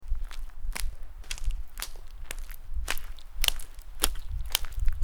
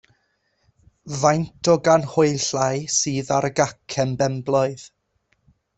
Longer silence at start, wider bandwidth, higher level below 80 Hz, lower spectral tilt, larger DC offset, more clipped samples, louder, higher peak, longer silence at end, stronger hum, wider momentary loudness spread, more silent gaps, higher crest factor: second, 0 s vs 1.05 s; first, over 20 kHz vs 8.4 kHz; first, -32 dBFS vs -58 dBFS; second, -1.5 dB/octave vs -4.5 dB/octave; neither; neither; second, -34 LUFS vs -21 LUFS; about the same, -2 dBFS vs -2 dBFS; second, 0 s vs 0.9 s; neither; first, 15 LU vs 7 LU; neither; first, 26 dB vs 20 dB